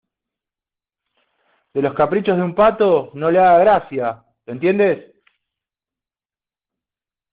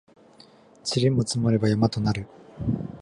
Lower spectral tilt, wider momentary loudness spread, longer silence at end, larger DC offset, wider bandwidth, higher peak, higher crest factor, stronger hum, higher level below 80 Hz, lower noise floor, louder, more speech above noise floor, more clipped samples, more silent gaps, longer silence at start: about the same, -5.5 dB/octave vs -6 dB/octave; first, 14 LU vs 10 LU; first, 2.35 s vs 0 s; neither; second, 4.9 kHz vs 11.5 kHz; first, -2 dBFS vs -8 dBFS; about the same, 16 dB vs 18 dB; neither; second, -56 dBFS vs -48 dBFS; first, under -90 dBFS vs -53 dBFS; first, -16 LUFS vs -25 LUFS; first, over 74 dB vs 30 dB; neither; neither; first, 1.75 s vs 0.85 s